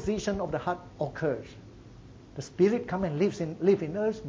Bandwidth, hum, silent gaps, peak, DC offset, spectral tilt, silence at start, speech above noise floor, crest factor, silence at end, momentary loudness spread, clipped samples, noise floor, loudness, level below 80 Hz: 8 kHz; none; none; -12 dBFS; under 0.1%; -7 dB/octave; 0 s; 21 dB; 18 dB; 0 s; 16 LU; under 0.1%; -49 dBFS; -29 LUFS; -52 dBFS